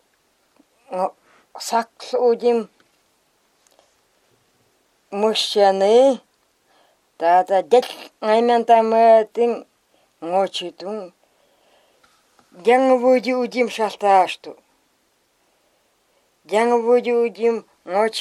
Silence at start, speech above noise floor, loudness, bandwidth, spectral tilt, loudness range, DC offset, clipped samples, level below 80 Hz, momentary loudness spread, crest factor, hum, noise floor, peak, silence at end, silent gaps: 0.9 s; 47 dB; -18 LUFS; 13 kHz; -4 dB/octave; 7 LU; under 0.1%; under 0.1%; -78 dBFS; 16 LU; 18 dB; none; -64 dBFS; -2 dBFS; 0 s; none